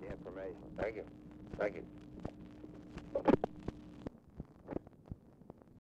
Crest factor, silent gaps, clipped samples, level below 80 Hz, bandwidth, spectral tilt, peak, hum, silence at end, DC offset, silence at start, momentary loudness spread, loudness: 24 dB; none; under 0.1%; -58 dBFS; 9.4 kHz; -8.5 dB/octave; -18 dBFS; none; 0.1 s; under 0.1%; 0 s; 20 LU; -41 LUFS